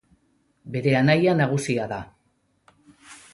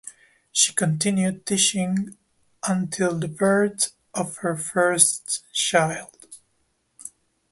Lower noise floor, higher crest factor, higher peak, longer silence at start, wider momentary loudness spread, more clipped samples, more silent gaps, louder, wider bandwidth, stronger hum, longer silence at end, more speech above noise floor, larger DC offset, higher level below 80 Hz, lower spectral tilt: about the same, -68 dBFS vs -70 dBFS; about the same, 18 dB vs 22 dB; second, -6 dBFS vs -2 dBFS; first, 0.65 s vs 0.05 s; second, 14 LU vs 18 LU; neither; neither; about the same, -22 LUFS vs -22 LUFS; about the same, 11.5 kHz vs 12 kHz; neither; second, 0.2 s vs 0.45 s; about the same, 47 dB vs 47 dB; neither; first, -58 dBFS vs -64 dBFS; first, -6.5 dB/octave vs -3 dB/octave